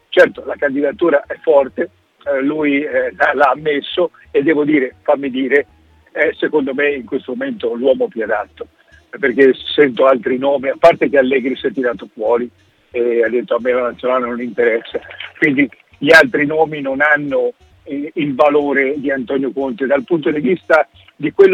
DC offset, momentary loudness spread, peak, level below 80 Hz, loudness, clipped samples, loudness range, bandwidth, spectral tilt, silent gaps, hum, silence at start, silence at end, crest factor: under 0.1%; 11 LU; 0 dBFS; -56 dBFS; -15 LUFS; under 0.1%; 4 LU; 12.5 kHz; -6 dB/octave; none; none; 0.1 s; 0 s; 16 dB